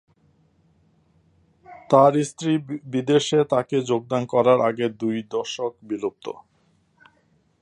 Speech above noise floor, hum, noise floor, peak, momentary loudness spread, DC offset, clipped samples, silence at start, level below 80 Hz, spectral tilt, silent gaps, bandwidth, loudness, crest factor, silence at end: 42 dB; none; -64 dBFS; -2 dBFS; 12 LU; under 0.1%; under 0.1%; 1.7 s; -68 dBFS; -6 dB/octave; none; 11 kHz; -22 LUFS; 22 dB; 1.3 s